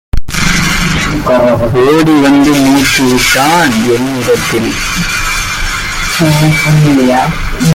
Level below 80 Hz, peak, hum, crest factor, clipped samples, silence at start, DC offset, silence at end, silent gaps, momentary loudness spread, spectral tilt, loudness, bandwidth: -22 dBFS; 0 dBFS; none; 8 dB; under 0.1%; 0.15 s; under 0.1%; 0 s; none; 6 LU; -4.5 dB/octave; -9 LUFS; 17 kHz